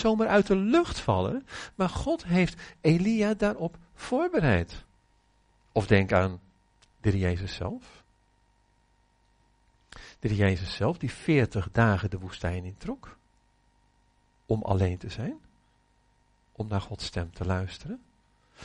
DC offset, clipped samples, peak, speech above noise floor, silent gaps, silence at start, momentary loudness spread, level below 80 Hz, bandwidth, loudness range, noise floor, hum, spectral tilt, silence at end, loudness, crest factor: under 0.1%; under 0.1%; -8 dBFS; 40 dB; none; 0 s; 16 LU; -48 dBFS; 10.5 kHz; 8 LU; -66 dBFS; 50 Hz at -50 dBFS; -7 dB/octave; 0 s; -28 LUFS; 22 dB